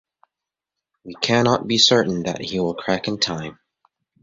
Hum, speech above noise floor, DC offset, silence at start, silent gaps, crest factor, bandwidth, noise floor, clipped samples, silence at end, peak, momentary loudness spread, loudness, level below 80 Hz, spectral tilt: none; 66 dB; under 0.1%; 1.05 s; none; 20 dB; 8 kHz; -86 dBFS; under 0.1%; 0.7 s; -2 dBFS; 13 LU; -19 LUFS; -56 dBFS; -4 dB/octave